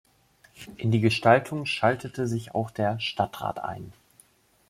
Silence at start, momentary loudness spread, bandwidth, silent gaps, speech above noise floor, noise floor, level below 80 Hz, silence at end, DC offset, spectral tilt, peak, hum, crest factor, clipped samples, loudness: 0.6 s; 18 LU; 15 kHz; none; 35 dB; -61 dBFS; -62 dBFS; 0.75 s; under 0.1%; -6 dB/octave; -6 dBFS; none; 22 dB; under 0.1%; -26 LUFS